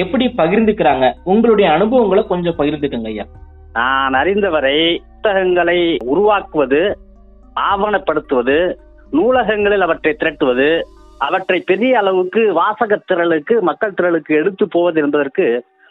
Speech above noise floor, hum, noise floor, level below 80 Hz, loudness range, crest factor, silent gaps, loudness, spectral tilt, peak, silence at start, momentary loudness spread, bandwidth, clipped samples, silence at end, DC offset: 28 dB; none; -42 dBFS; -42 dBFS; 2 LU; 12 dB; none; -15 LUFS; -8.5 dB/octave; -2 dBFS; 0 s; 7 LU; 4.1 kHz; under 0.1%; 0.3 s; under 0.1%